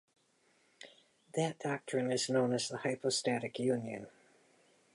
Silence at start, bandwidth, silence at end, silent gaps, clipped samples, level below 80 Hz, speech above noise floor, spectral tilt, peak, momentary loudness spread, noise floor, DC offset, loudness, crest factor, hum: 0.8 s; 11.5 kHz; 0.85 s; none; under 0.1%; -82 dBFS; 37 dB; -4 dB/octave; -20 dBFS; 23 LU; -72 dBFS; under 0.1%; -35 LUFS; 18 dB; none